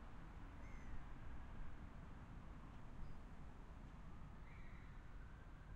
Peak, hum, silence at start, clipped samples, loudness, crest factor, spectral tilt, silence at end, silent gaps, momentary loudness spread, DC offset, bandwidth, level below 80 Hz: -40 dBFS; none; 0 s; under 0.1%; -59 LUFS; 14 dB; -7 dB/octave; 0 s; none; 3 LU; under 0.1%; 8.4 kHz; -56 dBFS